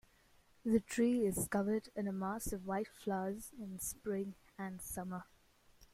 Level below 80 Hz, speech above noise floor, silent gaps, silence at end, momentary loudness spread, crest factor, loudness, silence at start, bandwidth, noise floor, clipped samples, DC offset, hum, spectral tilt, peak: -60 dBFS; 30 dB; none; 0.1 s; 13 LU; 18 dB; -39 LUFS; 0.65 s; 16 kHz; -69 dBFS; under 0.1%; under 0.1%; none; -5.5 dB/octave; -20 dBFS